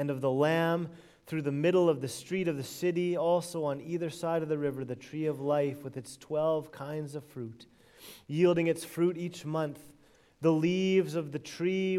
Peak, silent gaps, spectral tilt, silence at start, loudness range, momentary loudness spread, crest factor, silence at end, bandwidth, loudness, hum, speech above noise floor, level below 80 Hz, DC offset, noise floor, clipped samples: -14 dBFS; none; -6.5 dB/octave; 0 s; 4 LU; 14 LU; 18 dB; 0 s; 15.5 kHz; -31 LUFS; none; 31 dB; -72 dBFS; under 0.1%; -61 dBFS; under 0.1%